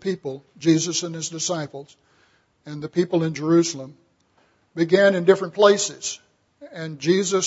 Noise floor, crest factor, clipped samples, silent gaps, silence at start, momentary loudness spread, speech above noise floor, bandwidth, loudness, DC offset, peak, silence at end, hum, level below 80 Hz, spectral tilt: -62 dBFS; 20 dB; under 0.1%; none; 0.05 s; 19 LU; 41 dB; 8 kHz; -21 LUFS; under 0.1%; -2 dBFS; 0 s; none; -70 dBFS; -4.5 dB/octave